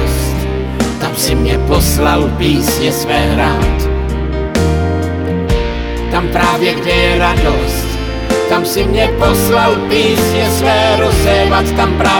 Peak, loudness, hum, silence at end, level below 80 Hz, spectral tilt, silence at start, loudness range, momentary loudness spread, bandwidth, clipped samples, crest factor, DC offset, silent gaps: 0 dBFS; -13 LUFS; none; 0 s; -20 dBFS; -5 dB/octave; 0 s; 4 LU; 6 LU; 20 kHz; under 0.1%; 12 dB; under 0.1%; none